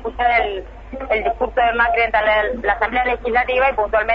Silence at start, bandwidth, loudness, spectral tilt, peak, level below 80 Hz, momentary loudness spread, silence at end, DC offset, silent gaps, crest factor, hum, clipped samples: 0 s; 5.4 kHz; -17 LUFS; -6 dB/octave; -4 dBFS; -36 dBFS; 7 LU; 0 s; under 0.1%; none; 14 dB; none; under 0.1%